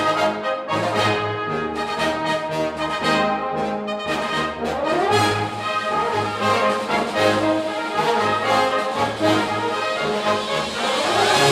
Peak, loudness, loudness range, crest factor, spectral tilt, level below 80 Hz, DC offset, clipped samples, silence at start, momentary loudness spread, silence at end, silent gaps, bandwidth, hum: -4 dBFS; -21 LUFS; 2 LU; 16 dB; -4 dB/octave; -52 dBFS; under 0.1%; under 0.1%; 0 s; 6 LU; 0 s; none; 16 kHz; none